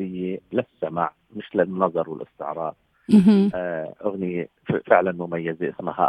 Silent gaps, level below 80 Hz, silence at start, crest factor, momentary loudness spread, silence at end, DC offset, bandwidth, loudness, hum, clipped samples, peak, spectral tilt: none; -62 dBFS; 0 s; 22 dB; 14 LU; 0 s; under 0.1%; 10 kHz; -23 LUFS; none; under 0.1%; -2 dBFS; -8.5 dB/octave